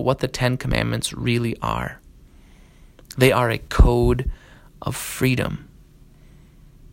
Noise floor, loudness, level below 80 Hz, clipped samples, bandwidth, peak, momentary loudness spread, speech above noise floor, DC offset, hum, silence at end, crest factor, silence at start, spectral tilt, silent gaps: -48 dBFS; -22 LUFS; -28 dBFS; under 0.1%; 16.5 kHz; 0 dBFS; 14 LU; 29 dB; under 0.1%; none; 1.3 s; 22 dB; 0 s; -5.5 dB/octave; none